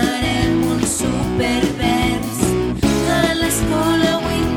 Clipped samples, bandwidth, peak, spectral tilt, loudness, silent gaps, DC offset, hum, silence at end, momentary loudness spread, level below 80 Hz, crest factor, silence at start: under 0.1%; 18 kHz; 0 dBFS; -4.5 dB/octave; -17 LUFS; none; under 0.1%; none; 0 s; 3 LU; -30 dBFS; 16 dB; 0 s